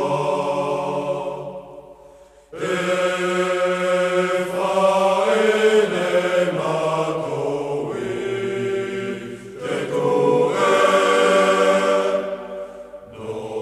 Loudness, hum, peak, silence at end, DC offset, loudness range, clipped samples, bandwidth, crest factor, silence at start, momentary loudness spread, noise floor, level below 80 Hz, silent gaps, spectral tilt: -20 LUFS; none; -2 dBFS; 0 s; under 0.1%; 6 LU; under 0.1%; 13.5 kHz; 18 dB; 0 s; 16 LU; -47 dBFS; -58 dBFS; none; -4.5 dB/octave